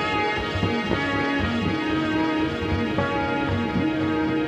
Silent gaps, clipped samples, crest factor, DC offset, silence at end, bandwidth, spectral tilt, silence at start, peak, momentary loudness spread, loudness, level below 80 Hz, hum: none; under 0.1%; 16 dB; under 0.1%; 0 s; 10 kHz; -6.5 dB/octave; 0 s; -8 dBFS; 1 LU; -24 LUFS; -42 dBFS; none